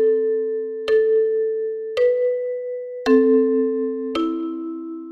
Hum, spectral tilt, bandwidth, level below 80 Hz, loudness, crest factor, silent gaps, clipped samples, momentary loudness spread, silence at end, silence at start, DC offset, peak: none; -5.5 dB/octave; 6.2 kHz; -60 dBFS; -21 LUFS; 14 dB; none; under 0.1%; 11 LU; 0 s; 0 s; under 0.1%; -6 dBFS